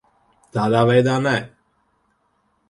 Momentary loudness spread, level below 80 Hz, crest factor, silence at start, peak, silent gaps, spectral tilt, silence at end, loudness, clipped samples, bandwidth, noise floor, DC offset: 13 LU; -58 dBFS; 20 dB; 0.55 s; -2 dBFS; none; -6.5 dB/octave; 1.25 s; -19 LUFS; under 0.1%; 11.5 kHz; -66 dBFS; under 0.1%